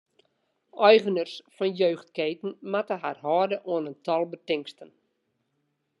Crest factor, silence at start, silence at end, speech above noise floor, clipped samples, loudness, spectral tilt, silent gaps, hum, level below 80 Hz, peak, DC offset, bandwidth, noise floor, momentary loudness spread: 24 dB; 0.75 s; 1.15 s; 50 dB; under 0.1%; -26 LUFS; -6 dB/octave; none; none; -86 dBFS; -4 dBFS; under 0.1%; 10.5 kHz; -76 dBFS; 12 LU